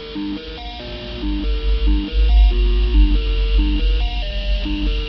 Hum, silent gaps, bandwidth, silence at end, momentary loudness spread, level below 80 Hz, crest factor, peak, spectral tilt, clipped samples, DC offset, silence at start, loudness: none; none; 5.8 kHz; 0 s; 13 LU; -16 dBFS; 14 dB; -4 dBFS; -8 dB/octave; under 0.1%; under 0.1%; 0 s; -20 LUFS